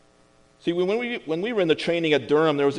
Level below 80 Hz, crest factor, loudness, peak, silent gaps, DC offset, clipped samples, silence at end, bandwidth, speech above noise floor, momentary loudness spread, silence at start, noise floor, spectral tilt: -64 dBFS; 16 dB; -23 LUFS; -6 dBFS; none; under 0.1%; under 0.1%; 0 s; 10.5 kHz; 35 dB; 8 LU; 0.65 s; -58 dBFS; -6 dB/octave